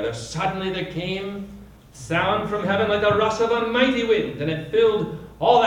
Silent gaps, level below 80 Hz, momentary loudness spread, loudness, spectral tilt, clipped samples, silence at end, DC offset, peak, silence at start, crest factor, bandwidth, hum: none; -48 dBFS; 10 LU; -22 LUFS; -5.5 dB/octave; under 0.1%; 0 s; under 0.1%; -4 dBFS; 0 s; 18 dB; 11 kHz; none